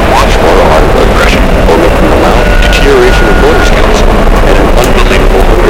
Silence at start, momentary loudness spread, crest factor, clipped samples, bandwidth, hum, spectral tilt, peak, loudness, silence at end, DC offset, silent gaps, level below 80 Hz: 0 s; 2 LU; 4 dB; 10%; 16.5 kHz; none; -5.5 dB/octave; 0 dBFS; -6 LUFS; 0 s; under 0.1%; none; -8 dBFS